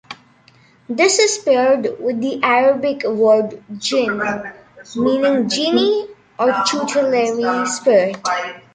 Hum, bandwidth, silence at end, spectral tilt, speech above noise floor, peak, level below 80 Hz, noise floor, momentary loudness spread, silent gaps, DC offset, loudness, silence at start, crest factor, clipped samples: none; 9.6 kHz; 0.15 s; -3 dB/octave; 34 dB; -2 dBFS; -62 dBFS; -51 dBFS; 11 LU; none; under 0.1%; -17 LUFS; 0.1 s; 16 dB; under 0.1%